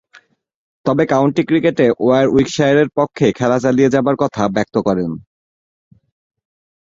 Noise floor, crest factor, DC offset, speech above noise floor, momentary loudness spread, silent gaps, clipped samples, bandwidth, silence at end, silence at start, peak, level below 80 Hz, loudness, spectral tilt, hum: -50 dBFS; 16 dB; under 0.1%; 35 dB; 6 LU; none; under 0.1%; 7.8 kHz; 1.65 s; 0.85 s; -2 dBFS; -50 dBFS; -15 LUFS; -6.5 dB/octave; none